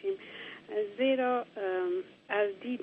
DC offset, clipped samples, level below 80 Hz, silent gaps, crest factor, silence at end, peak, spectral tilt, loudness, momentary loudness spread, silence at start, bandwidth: under 0.1%; under 0.1%; -82 dBFS; none; 14 dB; 0 s; -18 dBFS; -6.5 dB/octave; -32 LUFS; 10 LU; 0.05 s; 5 kHz